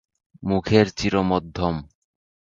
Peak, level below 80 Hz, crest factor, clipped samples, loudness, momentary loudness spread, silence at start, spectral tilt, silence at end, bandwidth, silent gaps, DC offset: -2 dBFS; -44 dBFS; 20 dB; under 0.1%; -22 LUFS; 10 LU; 0.4 s; -6.5 dB/octave; 0.6 s; 7.6 kHz; none; under 0.1%